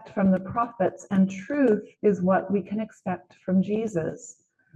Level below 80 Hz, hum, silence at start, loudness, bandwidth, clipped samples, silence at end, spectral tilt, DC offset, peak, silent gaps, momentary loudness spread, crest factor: -64 dBFS; none; 0 s; -26 LUFS; 8 kHz; under 0.1%; 0.45 s; -8 dB/octave; under 0.1%; -10 dBFS; none; 10 LU; 16 dB